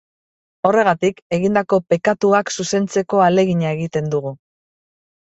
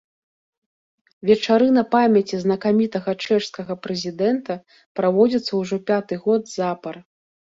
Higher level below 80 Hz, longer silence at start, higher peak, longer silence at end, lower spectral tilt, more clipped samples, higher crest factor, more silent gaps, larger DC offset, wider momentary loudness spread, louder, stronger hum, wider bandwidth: first, -58 dBFS vs -64 dBFS; second, 0.65 s vs 1.25 s; about the same, -2 dBFS vs -4 dBFS; first, 0.85 s vs 0.55 s; about the same, -5.5 dB/octave vs -6 dB/octave; neither; about the same, 16 dB vs 18 dB; about the same, 1.22-1.30 s vs 4.86-4.95 s; neither; second, 6 LU vs 14 LU; about the same, -18 LUFS vs -20 LUFS; neither; about the same, 8.2 kHz vs 7.8 kHz